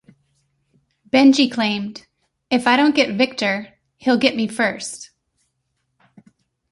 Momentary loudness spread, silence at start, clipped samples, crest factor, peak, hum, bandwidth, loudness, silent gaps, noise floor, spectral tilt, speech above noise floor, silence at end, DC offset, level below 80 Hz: 14 LU; 1.15 s; under 0.1%; 18 dB; -2 dBFS; none; 11.5 kHz; -18 LUFS; none; -72 dBFS; -4 dB/octave; 55 dB; 1.65 s; under 0.1%; -64 dBFS